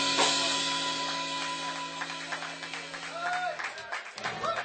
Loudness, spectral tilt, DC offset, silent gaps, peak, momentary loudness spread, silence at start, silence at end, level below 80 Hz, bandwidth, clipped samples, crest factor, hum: -31 LUFS; -1 dB/octave; under 0.1%; none; -10 dBFS; 12 LU; 0 s; 0 s; -72 dBFS; 9.2 kHz; under 0.1%; 22 dB; none